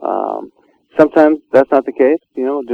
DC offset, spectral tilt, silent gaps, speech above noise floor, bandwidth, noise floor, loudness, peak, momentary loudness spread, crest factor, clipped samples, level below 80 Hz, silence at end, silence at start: under 0.1%; -8 dB/octave; none; 35 dB; 6.4 kHz; -47 dBFS; -14 LUFS; 0 dBFS; 12 LU; 14 dB; 0.3%; -56 dBFS; 0 s; 0 s